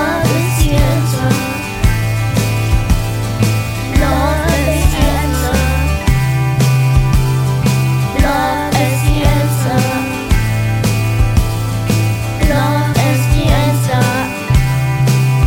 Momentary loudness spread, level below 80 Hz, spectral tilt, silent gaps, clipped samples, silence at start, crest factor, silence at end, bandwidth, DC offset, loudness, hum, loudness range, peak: 3 LU; -20 dBFS; -5.5 dB/octave; none; under 0.1%; 0 s; 12 dB; 0 s; 17 kHz; under 0.1%; -14 LUFS; none; 1 LU; 0 dBFS